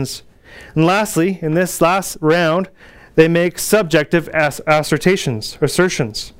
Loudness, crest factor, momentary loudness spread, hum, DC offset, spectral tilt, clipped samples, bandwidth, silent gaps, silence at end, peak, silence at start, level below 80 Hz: -16 LUFS; 16 dB; 7 LU; none; under 0.1%; -5 dB/octave; under 0.1%; 16.5 kHz; none; 0.1 s; 0 dBFS; 0 s; -44 dBFS